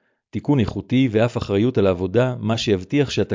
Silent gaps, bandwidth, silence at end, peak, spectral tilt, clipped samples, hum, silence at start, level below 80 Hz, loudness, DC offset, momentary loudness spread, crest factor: none; 7.6 kHz; 0 s; -6 dBFS; -7 dB/octave; under 0.1%; none; 0.35 s; -42 dBFS; -20 LUFS; under 0.1%; 3 LU; 14 dB